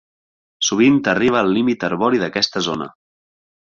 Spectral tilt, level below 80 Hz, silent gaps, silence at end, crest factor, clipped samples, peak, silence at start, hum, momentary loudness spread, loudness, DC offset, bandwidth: -4 dB/octave; -56 dBFS; none; 0.8 s; 16 dB; under 0.1%; -2 dBFS; 0.6 s; none; 8 LU; -17 LUFS; under 0.1%; 7.4 kHz